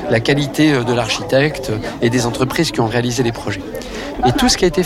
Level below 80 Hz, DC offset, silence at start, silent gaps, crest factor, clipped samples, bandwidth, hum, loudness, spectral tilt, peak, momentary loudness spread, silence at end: -36 dBFS; under 0.1%; 0 s; none; 12 dB; under 0.1%; 16.5 kHz; none; -16 LUFS; -4.5 dB/octave; -4 dBFS; 11 LU; 0 s